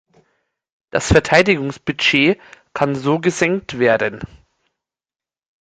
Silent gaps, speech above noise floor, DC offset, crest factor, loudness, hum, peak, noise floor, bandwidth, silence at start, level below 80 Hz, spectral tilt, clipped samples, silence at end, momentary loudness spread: none; over 73 dB; under 0.1%; 18 dB; -17 LUFS; none; 0 dBFS; under -90 dBFS; 9.6 kHz; 0.95 s; -38 dBFS; -4.5 dB/octave; under 0.1%; 1.35 s; 12 LU